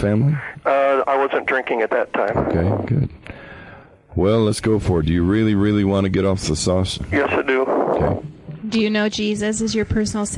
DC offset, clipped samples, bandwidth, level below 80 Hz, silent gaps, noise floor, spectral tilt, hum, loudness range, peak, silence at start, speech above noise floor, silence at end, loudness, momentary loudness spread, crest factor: under 0.1%; under 0.1%; 11.5 kHz; -40 dBFS; none; -43 dBFS; -6 dB/octave; none; 2 LU; -6 dBFS; 0 s; 24 dB; 0 s; -19 LUFS; 8 LU; 12 dB